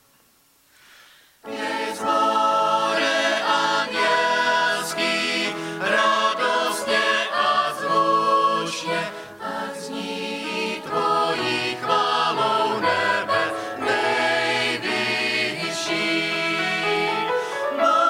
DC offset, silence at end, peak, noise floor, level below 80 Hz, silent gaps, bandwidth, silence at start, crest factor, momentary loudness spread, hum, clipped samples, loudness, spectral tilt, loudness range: under 0.1%; 0 s; -6 dBFS; -59 dBFS; -70 dBFS; none; 16 kHz; 1.45 s; 16 dB; 7 LU; none; under 0.1%; -21 LUFS; -2.5 dB/octave; 3 LU